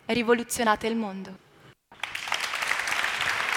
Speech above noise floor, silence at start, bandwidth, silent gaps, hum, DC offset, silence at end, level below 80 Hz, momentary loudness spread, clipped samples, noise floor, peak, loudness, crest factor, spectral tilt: 28 dB; 0.1 s; 18 kHz; none; none; under 0.1%; 0 s; -60 dBFS; 12 LU; under 0.1%; -54 dBFS; -6 dBFS; -27 LUFS; 22 dB; -2.5 dB/octave